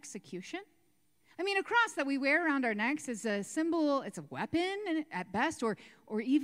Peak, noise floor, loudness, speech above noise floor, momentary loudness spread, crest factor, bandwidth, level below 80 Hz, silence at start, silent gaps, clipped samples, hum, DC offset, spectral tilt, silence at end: -16 dBFS; -74 dBFS; -33 LUFS; 41 dB; 14 LU; 16 dB; 15 kHz; -74 dBFS; 0.05 s; none; under 0.1%; none; under 0.1%; -4 dB/octave; 0 s